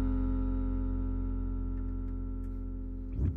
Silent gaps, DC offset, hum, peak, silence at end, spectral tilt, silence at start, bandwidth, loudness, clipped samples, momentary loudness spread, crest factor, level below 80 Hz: none; under 0.1%; none; -20 dBFS; 0 s; -12 dB/octave; 0 s; 2.3 kHz; -36 LUFS; under 0.1%; 7 LU; 12 dB; -34 dBFS